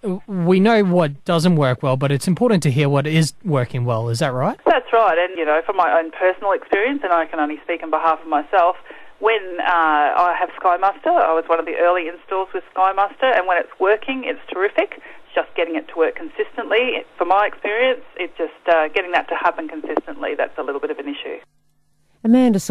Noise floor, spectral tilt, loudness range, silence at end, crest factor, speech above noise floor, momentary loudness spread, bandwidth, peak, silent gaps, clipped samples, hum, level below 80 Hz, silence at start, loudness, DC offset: -64 dBFS; -6 dB/octave; 4 LU; 0 s; 14 dB; 45 dB; 10 LU; 14.5 kHz; -4 dBFS; none; under 0.1%; none; -60 dBFS; 0.05 s; -19 LUFS; under 0.1%